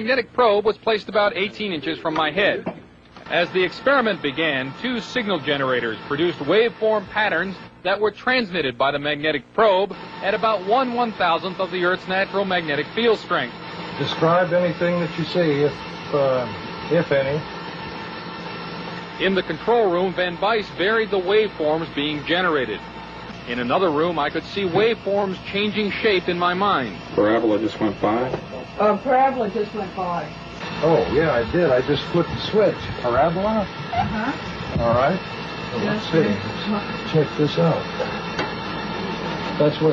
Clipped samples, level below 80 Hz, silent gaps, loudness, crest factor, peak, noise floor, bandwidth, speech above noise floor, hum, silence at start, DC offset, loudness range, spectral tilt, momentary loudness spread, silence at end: under 0.1%; -48 dBFS; none; -21 LUFS; 16 dB; -4 dBFS; -43 dBFS; 7.4 kHz; 23 dB; none; 0 s; under 0.1%; 2 LU; -6.5 dB/octave; 10 LU; 0 s